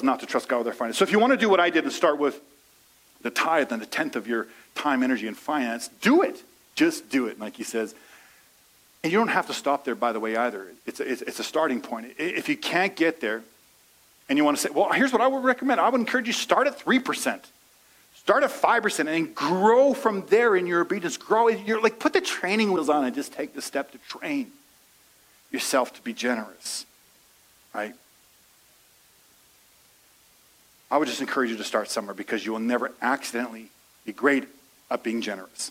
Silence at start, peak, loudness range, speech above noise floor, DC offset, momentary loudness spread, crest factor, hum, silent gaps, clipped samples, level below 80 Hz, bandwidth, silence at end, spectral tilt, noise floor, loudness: 0 s; -4 dBFS; 9 LU; 34 dB; under 0.1%; 12 LU; 22 dB; none; none; under 0.1%; -74 dBFS; 16 kHz; 0 s; -3.5 dB/octave; -58 dBFS; -25 LUFS